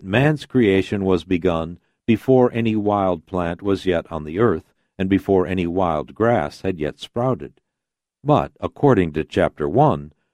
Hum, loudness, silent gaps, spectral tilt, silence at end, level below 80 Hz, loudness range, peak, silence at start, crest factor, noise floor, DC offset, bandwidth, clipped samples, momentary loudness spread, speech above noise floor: none; -20 LUFS; none; -8 dB/octave; 0.25 s; -46 dBFS; 3 LU; -2 dBFS; 0 s; 18 dB; -84 dBFS; under 0.1%; 12 kHz; under 0.1%; 10 LU; 65 dB